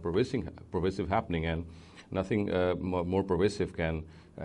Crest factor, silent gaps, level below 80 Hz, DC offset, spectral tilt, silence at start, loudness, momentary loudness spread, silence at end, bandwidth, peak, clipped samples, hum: 16 dB; none; -48 dBFS; under 0.1%; -7 dB/octave; 0 s; -32 LUFS; 9 LU; 0 s; 10.5 kHz; -14 dBFS; under 0.1%; none